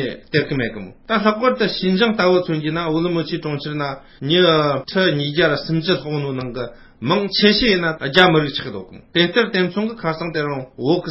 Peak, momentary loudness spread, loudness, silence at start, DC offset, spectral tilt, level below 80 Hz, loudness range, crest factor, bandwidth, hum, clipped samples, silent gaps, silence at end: 0 dBFS; 12 LU; -18 LUFS; 0 s; under 0.1%; -7.5 dB/octave; -48 dBFS; 2 LU; 18 dB; 8 kHz; none; under 0.1%; none; 0 s